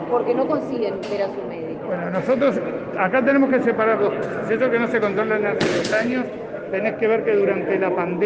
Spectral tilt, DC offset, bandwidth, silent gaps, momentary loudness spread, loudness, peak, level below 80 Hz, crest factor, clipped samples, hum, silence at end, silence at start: -6 dB/octave; under 0.1%; 9.2 kHz; none; 8 LU; -21 LUFS; -4 dBFS; -60 dBFS; 16 dB; under 0.1%; none; 0 s; 0 s